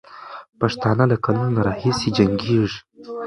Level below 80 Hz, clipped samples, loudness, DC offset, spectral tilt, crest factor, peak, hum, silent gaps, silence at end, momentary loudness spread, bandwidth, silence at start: -46 dBFS; under 0.1%; -20 LUFS; under 0.1%; -7 dB/octave; 20 dB; 0 dBFS; none; 0.49-0.53 s; 0 s; 17 LU; 11 kHz; 0.1 s